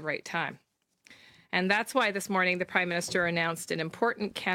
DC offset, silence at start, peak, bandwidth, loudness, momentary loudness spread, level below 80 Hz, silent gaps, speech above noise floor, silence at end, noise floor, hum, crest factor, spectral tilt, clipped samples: under 0.1%; 0 s; -8 dBFS; 17 kHz; -29 LUFS; 7 LU; -70 dBFS; none; 31 dB; 0 s; -60 dBFS; none; 22 dB; -4 dB/octave; under 0.1%